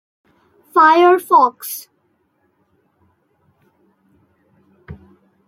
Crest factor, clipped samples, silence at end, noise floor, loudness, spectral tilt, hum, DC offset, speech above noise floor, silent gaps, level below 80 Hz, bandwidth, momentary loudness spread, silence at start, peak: 18 dB; under 0.1%; 0.55 s; -64 dBFS; -13 LUFS; -4 dB/octave; none; under 0.1%; 51 dB; none; -60 dBFS; 16.5 kHz; 18 LU; 0.75 s; -2 dBFS